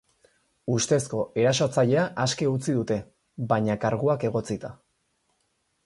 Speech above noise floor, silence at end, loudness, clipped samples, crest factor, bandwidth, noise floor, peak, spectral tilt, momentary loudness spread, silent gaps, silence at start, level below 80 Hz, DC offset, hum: 48 dB; 1.1 s; -25 LUFS; under 0.1%; 18 dB; 11.5 kHz; -73 dBFS; -8 dBFS; -5 dB/octave; 12 LU; none; 0.65 s; -60 dBFS; under 0.1%; none